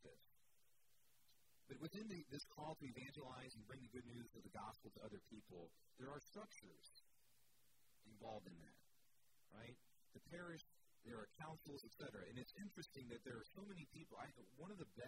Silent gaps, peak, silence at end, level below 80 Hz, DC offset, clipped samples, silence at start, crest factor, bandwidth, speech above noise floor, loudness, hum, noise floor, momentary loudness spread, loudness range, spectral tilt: none; -38 dBFS; 0 s; -80 dBFS; under 0.1%; under 0.1%; 0 s; 20 dB; 16 kHz; 25 dB; -58 LUFS; none; -83 dBFS; 9 LU; 6 LU; -5 dB/octave